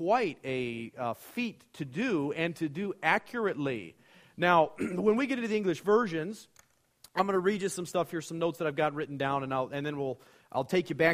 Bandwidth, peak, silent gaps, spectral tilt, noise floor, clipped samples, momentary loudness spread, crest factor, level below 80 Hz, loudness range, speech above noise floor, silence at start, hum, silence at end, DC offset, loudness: 15.5 kHz; -8 dBFS; none; -5.5 dB/octave; -65 dBFS; under 0.1%; 10 LU; 22 dB; -70 dBFS; 3 LU; 35 dB; 0 s; none; 0 s; under 0.1%; -31 LUFS